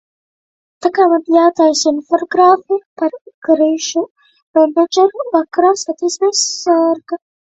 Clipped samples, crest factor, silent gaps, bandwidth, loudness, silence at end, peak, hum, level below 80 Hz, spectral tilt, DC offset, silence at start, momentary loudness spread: under 0.1%; 14 dB; 2.86-2.96 s, 3.21-3.25 s, 3.34-3.42 s, 4.11-4.15 s, 4.42-4.54 s; 8.2 kHz; -14 LUFS; 0.35 s; 0 dBFS; none; -64 dBFS; -1.5 dB/octave; under 0.1%; 0.8 s; 10 LU